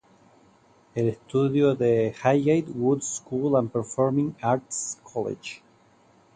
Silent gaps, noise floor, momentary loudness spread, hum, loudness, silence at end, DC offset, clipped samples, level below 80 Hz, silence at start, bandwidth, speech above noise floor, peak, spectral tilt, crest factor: none; -59 dBFS; 10 LU; none; -25 LUFS; 0.8 s; under 0.1%; under 0.1%; -64 dBFS; 0.95 s; 9.6 kHz; 34 dB; -6 dBFS; -6 dB/octave; 20 dB